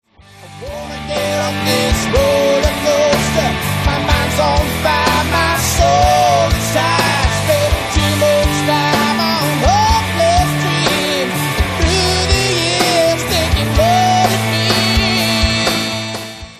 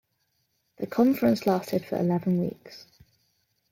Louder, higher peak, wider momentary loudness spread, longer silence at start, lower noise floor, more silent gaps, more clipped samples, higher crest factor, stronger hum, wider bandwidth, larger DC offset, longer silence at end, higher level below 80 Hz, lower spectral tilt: first, -13 LUFS vs -26 LUFS; first, 0 dBFS vs -10 dBFS; second, 5 LU vs 15 LU; second, 0.35 s vs 0.8 s; second, -39 dBFS vs -74 dBFS; neither; neither; about the same, 14 dB vs 18 dB; neither; second, 14 kHz vs 16.5 kHz; neither; second, 0 s vs 0.95 s; first, -24 dBFS vs -66 dBFS; second, -4 dB/octave vs -7.5 dB/octave